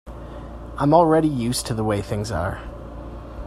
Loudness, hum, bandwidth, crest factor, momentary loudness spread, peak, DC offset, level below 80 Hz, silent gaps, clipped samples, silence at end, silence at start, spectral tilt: -21 LUFS; none; 16 kHz; 20 dB; 21 LU; -2 dBFS; under 0.1%; -38 dBFS; none; under 0.1%; 0 s; 0.05 s; -6 dB/octave